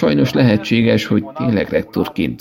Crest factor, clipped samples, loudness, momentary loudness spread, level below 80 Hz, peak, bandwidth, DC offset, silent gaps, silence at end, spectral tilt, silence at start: 14 dB; under 0.1%; -16 LUFS; 6 LU; -44 dBFS; -2 dBFS; 16.5 kHz; under 0.1%; none; 0.05 s; -7 dB/octave; 0 s